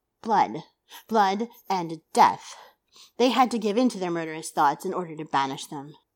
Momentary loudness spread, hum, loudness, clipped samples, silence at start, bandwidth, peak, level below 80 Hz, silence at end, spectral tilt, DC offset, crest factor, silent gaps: 14 LU; none; -25 LUFS; under 0.1%; 0.25 s; 17.5 kHz; -6 dBFS; -78 dBFS; 0.25 s; -4.5 dB/octave; under 0.1%; 20 dB; none